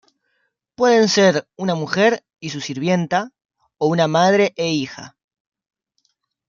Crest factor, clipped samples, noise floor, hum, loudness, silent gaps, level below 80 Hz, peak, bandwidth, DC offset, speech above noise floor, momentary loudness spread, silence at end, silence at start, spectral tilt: 18 dB; under 0.1%; -70 dBFS; none; -18 LUFS; 3.45-3.49 s; -66 dBFS; -2 dBFS; 7.4 kHz; under 0.1%; 52 dB; 13 LU; 1.4 s; 0.8 s; -5 dB/octave